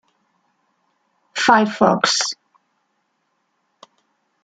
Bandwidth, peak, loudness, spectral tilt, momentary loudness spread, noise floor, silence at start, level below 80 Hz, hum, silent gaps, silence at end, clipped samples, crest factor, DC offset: 9.4 kHz; -2 dBFS; -17 LUFS; -3 dB/octave; 14 LU; -70 dBFS; 1.35 s; -64 dBFS; none; none; 2.1 s; under 0.1%; 22 dB; under 0.1%